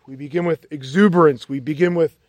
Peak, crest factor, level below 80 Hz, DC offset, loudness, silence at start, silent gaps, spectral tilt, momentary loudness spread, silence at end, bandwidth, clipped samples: -2 dBFS; 16 dB; -64 dBFS; under 0.1%; -18 LUFS; 0.1 s; none; -7.5 dB/octave; 13 LU; 0.2 s; 9.8 kHz; under 0.1%